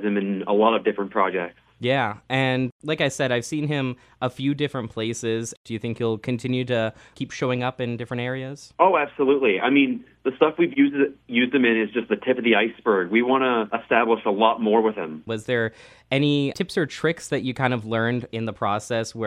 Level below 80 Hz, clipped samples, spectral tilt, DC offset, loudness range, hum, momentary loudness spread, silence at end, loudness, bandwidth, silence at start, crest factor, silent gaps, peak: -62 dBFS; under 0.1%; -5.5 dB/octave; under 0.1%; 6 LU; none; 10 LU; 0 s; -23 LUFS; 12.5 kHz; 0 s; 20 dB; 2.72-2.79 s, 5.57-5.65 s; -2 dBFS